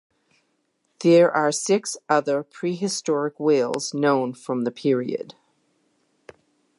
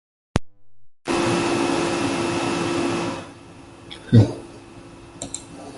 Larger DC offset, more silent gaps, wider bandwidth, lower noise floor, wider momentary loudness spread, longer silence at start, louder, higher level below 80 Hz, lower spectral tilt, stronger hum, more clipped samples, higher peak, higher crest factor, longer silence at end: neither; neither; about the same, 11.5 kHz vs 11.5 kHz; first, -71 dBFS vs -44 dBFS; second, 10 LU vs 25 LU; first, 1 s vs 0.35 s; about the same, -22 LUFS vs -22 LUFS; second, -78 dBFS vs -46 dBFS; about the same, -4.5 dB/octave vs -5.5 dB/octave; neither; neither; second, -4 dBFS vs 0 dBFS; about the same, 20 dB vs 24 dB; first, 1.45 s vs 0 s